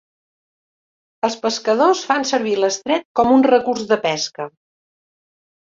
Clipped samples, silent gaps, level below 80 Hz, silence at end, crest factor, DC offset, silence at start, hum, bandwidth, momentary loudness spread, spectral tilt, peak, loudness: under 0.1%; 3.05-3.15 s; -60 dBFS; 1.3 s; 18 dB; under 0.1%; 1.25 s; none; 7.8 kHz; 10 LU; -3.5 dB/octave; -2 dBFS; -18 LUFS